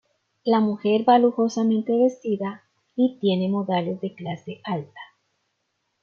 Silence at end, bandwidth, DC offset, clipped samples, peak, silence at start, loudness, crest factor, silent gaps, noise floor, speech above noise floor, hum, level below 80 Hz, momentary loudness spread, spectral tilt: 1 s; 7 kHz; under 0.1%; under 0.1%; -6 dBFS; 0.45 s; -23 LUFS; 18 dB; none; -75 dBFS; 53 dB; none; -72 dBFS; 15 LU; -7 dB/octave